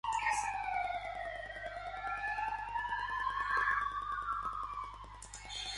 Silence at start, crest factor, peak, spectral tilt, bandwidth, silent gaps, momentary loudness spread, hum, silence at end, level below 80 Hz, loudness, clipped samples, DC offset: 0.05 s; 18 dB; -20 dBFS; -1.5 dB/octave; 11.5 kHz; none; 11 LU; 50 Hz at -55 dBFS; 0 s; -56 dBFS; -37 LUFS; under 0.1%; under 0.1%